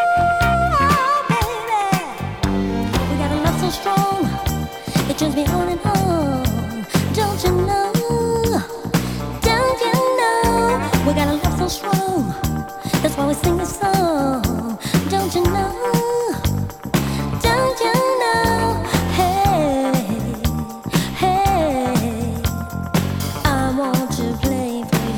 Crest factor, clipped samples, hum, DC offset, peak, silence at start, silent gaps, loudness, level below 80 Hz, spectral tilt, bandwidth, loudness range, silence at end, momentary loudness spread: 18 dB; under 0.1%; none; under 0.1%; 0 dBFS; 0 s; none; -19 LUFS; -32 dBFS; -5.5 dB/octave; 19.5 kHz; 2 LU; 0 s; 6 LU